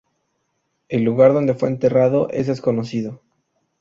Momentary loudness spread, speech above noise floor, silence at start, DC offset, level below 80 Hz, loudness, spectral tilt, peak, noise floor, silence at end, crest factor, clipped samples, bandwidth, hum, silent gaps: 12 LU; 54 dB; 0.9 s; under 0.1%; -58 dBFS; -18 LUFS; -8.5 dB/octave; -2 dBFS; -71 dBFS; 0.65 s; 18 dB; under 0.1%; 7.4 kHz; none; none